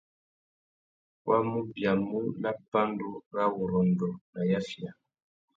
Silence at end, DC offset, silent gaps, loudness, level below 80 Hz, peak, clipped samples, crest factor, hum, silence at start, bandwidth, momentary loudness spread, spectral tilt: 0.65 s; under 0.1%; 2.68-2.72 s, 3.26-3.31 s, 4.21-4.33 s; -30 LUFS; -64 dBFS; -12 dBFS; under 0.1%; 20 dB; none; 1.25 s; 7.6 kHz; 10 LU; -8 dB/octave